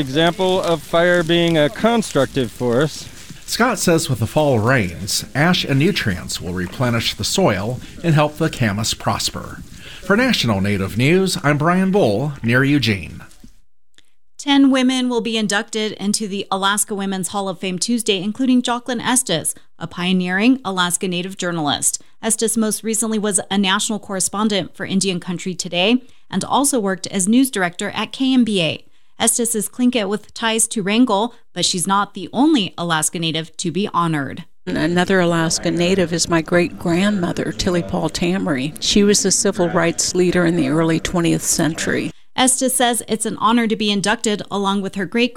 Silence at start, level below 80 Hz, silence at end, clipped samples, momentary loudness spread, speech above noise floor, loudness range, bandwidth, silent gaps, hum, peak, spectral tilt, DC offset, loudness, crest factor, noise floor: 0 s; -46 dBFS; 0.05 s; under 0.1%; 8 LU; 40 dB; 2 LU; 19 kHz; none; none; -2 dBFS; -4 dB/octave; 0.8%; -18 LUFS; 16 dB; -58 dBFS